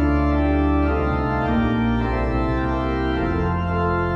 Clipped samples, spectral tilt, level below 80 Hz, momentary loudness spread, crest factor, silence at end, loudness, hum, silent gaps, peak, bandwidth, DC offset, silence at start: under 0.1%; -9 dB/octave; -26 dBFS; 3 LU; 12 dB; 0 s; -21 LUFS; none; none; -8 dBFS; 6.2 kHz; under 0.1%; 0 s